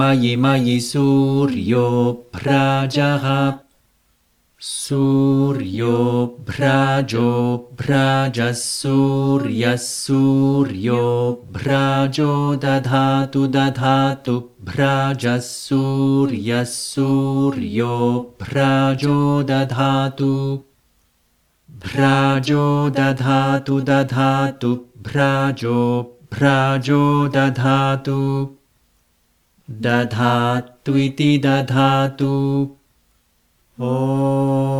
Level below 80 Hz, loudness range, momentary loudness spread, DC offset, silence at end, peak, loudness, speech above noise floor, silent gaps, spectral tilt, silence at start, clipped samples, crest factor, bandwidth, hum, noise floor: -54 dBFS; 2 LU; 7 LU; under 0.1%; 0 s; -2 dBFS; -18 LUFS; 45 dB; none; -6.5 dB/octave; 0 s; under 0.1%; 16 dB; 13.5 kHz; none; -62 dBFS